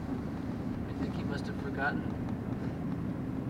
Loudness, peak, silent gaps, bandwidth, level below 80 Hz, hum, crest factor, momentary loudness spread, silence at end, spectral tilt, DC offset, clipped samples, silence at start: -36 LUFS; -20 dBFS; none; 16 kHz; -48 dBFS; none; 14 dB; 4 LU; 0 s; -8 dB/octave; under 0.1%; under 0.1%; 0 s